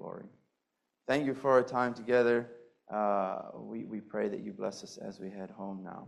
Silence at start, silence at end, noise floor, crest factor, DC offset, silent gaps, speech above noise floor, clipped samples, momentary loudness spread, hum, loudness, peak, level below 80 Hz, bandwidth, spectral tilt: 0 s; 0 s; -84 dBFS; 22 dB; under 0.1%; none; 51 dB; under 0.1%; 17 LU; none; -33 LUFS; -12 dBFS; -74 dBFS; 11.5 kHz; -6 dB/octave